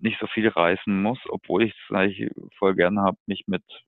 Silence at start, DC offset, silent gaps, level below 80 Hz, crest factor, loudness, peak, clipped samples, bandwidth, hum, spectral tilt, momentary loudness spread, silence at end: 0 s; under 0.1%; 3.20-3.26 s; -60 dBFS; 20 dB; -24 LUFS; -4 dBFS; under 0.1%; 4.2 kHz; none; -9.5 dB/octave; 10 LU; 0.1 s